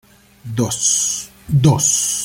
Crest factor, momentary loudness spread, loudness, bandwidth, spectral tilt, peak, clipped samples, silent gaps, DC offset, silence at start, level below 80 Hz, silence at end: 16 dB; 10 LU; -16 LUFS; 16.5 kHz; -4 dB/octave; -2 dBFS; under 0.1%; none; under 0.1%; 0.45 s; -46 dBFS; 0 s